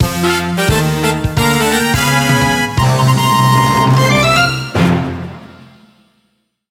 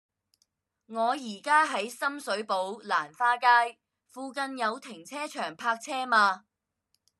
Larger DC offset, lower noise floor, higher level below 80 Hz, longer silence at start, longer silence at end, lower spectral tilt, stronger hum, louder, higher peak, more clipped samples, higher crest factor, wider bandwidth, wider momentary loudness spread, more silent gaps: neither; second, -63 dBFS vs -78 dBFS; first, -32 dBFS vs under -90 dBFS; second, 0 s vs 0.9 s; first, 1.2 s vs 0.8 s; first, -4.5 dB/octave vs -2 dB/octave; neither; first, -12 LUFS vs -28 LUFS; first, 0 dBFS vs -8 dBFS; neither; second, 14 dB vs 22 dB; first, 16.5 kHz vs 13 kHz; second, 5 LU vs 15 LU; neither